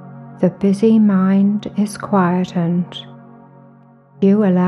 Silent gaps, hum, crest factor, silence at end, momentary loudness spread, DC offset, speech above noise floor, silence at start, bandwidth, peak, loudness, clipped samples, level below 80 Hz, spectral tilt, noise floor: none; none; 14 dB; 0 s; 9 LU; under 0.1%; 32 dB; 0 s; 11.5 kHz; -2 dBFS; -16 LUFS; under 0.1%; -60 dBFS; -8 dB/octave; -46 dBFS